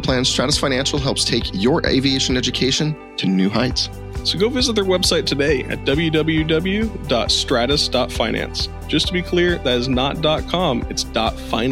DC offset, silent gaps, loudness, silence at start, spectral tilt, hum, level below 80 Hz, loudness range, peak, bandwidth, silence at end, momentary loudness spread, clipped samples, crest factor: under 0.1%; none; -18 LUFS; 0 s; -4 dB/octave; none; -32 dBFS; 1 LU; -2 dBFS; 16 kHz; 0 s; 5 LU; under 0.1%; 18 dB